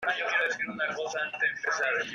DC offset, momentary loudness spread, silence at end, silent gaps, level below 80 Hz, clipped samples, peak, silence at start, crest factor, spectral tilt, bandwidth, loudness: under 0.1%; 5 LU; 0 s; none; -76 dBFS; under 0.1%; -16 dBFS; 0 s; 16 dB; -1.5 dB/octave; 13 kHz; -29 LUFS